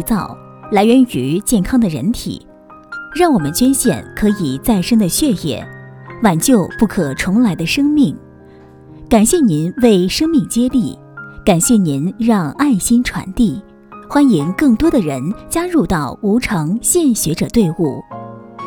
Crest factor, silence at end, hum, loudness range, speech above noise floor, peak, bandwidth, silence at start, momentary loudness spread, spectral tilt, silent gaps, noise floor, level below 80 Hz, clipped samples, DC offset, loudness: 14 dB; 0 s; none; 2 LU; 26 dB; 0 dBFS; over 20 kHz; 0 s; 14 LU; -5 dB/octave; none; -40 dBFS; -36 dBFS; under 0.1%; under 0.1%; -14 LUFS